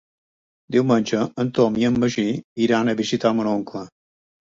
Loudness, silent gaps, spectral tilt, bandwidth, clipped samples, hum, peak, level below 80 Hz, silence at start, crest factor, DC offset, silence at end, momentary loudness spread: -21 LUFS; 2.44-2.56 s; -6 dB/octave; 7.8 kHz; under 0.1%; none; -4 dBFS; -56 dBFS; 0.7 s; 18 dB; under 0.1%; 0.55 s; 6 LU